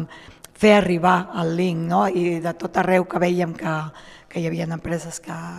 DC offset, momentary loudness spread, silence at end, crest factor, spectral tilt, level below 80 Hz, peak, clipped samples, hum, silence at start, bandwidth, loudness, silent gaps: under 0.1%; 13 LU; 0 s; 18 dB; -6 dB/octave; -52 dBFS; -2 dBFS; under 0.1%; none; 0 s; 13.5 kHz; -21 LUFS; none